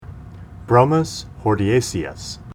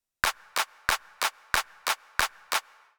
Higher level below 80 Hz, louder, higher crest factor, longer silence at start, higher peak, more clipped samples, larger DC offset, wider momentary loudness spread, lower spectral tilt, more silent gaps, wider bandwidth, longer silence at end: first, -42 dBFS vs -52 dBFS; first, -19 LUFS vs -29 LUFS; second, 20 dB vs 26 dB; second, 0 s vs 0.25 s; first, 0 dBFS vs -4 dBFS; neither; neither; first, 23 LU vs 3 LU; first, -6 dB/octave vs 0.5 dB/octave; neither; second, 16 kHz vs over 20 kHz; second, 0 s vs 0.4 s